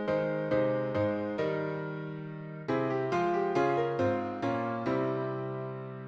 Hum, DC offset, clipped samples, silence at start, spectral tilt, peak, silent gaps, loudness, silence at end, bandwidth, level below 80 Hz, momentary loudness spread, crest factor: none; under 0.1%; under 0.1%; 0 s; -8 dB/octave; -16 dBFS; none; -32 LUFS; 0 s; 8 kHz; -66 dBFS; 10 LU; 14 dB